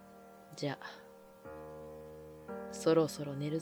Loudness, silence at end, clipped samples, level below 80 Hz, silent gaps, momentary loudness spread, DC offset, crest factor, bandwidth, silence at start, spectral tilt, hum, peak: -35 LUFS; 0 s; under 0.1%; -68 dBFS; none; 23 LU; under 0.1%; 20 dB; over 20 kHz; 0 s; -6 dB/octave; none; -18 dBFS